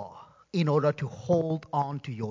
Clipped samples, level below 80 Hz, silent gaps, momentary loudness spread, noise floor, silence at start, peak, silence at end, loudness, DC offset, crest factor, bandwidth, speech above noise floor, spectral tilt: under 0.1%; -64 dBFS; none; 10 LU; -48 dBFS; 0 s; -12 dBFS; 0 s; -29 LUFS; under 0.1%; 18 dB; 7.6 kHz; 21 dB; -8 dB/octave